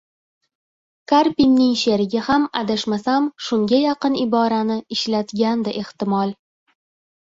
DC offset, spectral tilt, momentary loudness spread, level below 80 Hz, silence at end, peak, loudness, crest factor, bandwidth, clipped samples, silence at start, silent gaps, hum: under 0.1%; -5.5 dB/octave; 7 LU; -56 dBFS; 1.05 s; -4 dBFS; -19 LUFS; 16 dB; 7.8 kHz; under 0.1%; 1.1 s; none; none